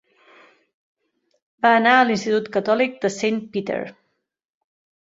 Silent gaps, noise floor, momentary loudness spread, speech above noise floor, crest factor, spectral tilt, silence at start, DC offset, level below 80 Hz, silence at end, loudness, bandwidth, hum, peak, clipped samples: none; -53 dBFS; 13 LU; 33 dB; 22 dB; -4.5 dB/octave; 1.65 s; under 0.1%; -68 dBFS; 1.1 s; -20 LUFS; 8 kHz; none; -2 dBFS; under 0.1%